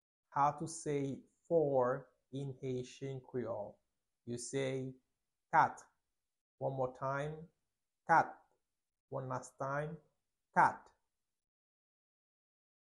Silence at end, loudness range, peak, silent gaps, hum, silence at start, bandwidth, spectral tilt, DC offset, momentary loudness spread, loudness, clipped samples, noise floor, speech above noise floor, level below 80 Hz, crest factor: 2 s; 3 LU; -16 dBFS; 6.41-6.58 s, 9.00-9.08 s; none; 0.3 s; 11.5 kHz; -5.5 dB/octave; under 0.1%; 17 LU; -37 LUFS; under 0.1%; under -90 dBFS; over 54 dB; -76 dBFS; 24 dB